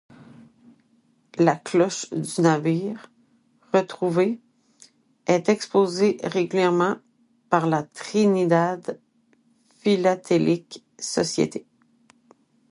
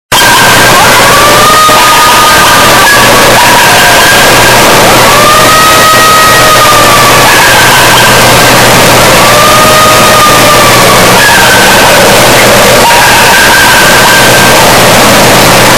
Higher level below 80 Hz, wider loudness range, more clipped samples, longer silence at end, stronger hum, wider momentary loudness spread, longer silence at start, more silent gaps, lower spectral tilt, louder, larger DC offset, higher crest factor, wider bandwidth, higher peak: second, -70 dBFS vs -24 dBFS; first, 3 LU vs 0 LU; second, under 0.1% vs 20%; first, 1.1 s vs 0 s; neither; first, 13 LU vs 0 LU; first, 1.35 s vs 0.1 s; neither; first, -5.5 dB/octave vs -2 dB/octave; second, -23 LUFS vs 0 LUFS; second, under 0.1% vs 8%; first, 22 dB vs 2 dB; second, 11.5 kHz vs over 20 kHz; about the same, -2 dBFS vs 0 dBFS